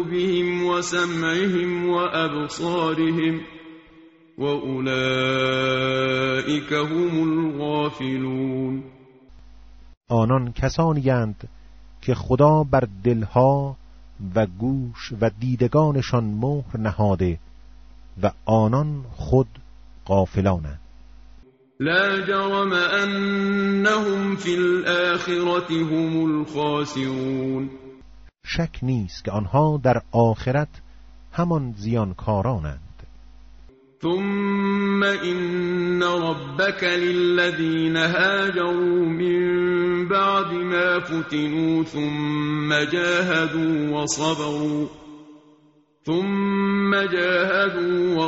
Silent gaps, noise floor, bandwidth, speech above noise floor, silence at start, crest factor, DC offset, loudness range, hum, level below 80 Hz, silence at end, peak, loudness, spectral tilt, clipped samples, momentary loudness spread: 9.97-10.01 s; -58 dBFS; 8 kHz; 36 dB; 0 s; 18 dB; under 0.1%; 4 LU; none; -46 dBFS; 0 s; -4 dBFS; -22 LUFS; -5 dB/octave; under 0.1%; 7 LU